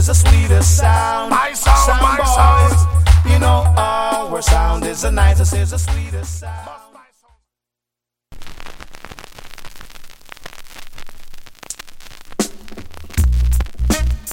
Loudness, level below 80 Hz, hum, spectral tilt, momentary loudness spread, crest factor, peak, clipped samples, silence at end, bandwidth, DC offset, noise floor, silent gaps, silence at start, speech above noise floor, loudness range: -15 LUFS; -20 dBFS; none; -4.5 dB/octave; 24 LU; 16 dB; 0 dBFS; under 0.1%; 0 s; 16.5 kHz; under 0.1%; -84 dBFS; none; 0 s; 72 dB; 24 LU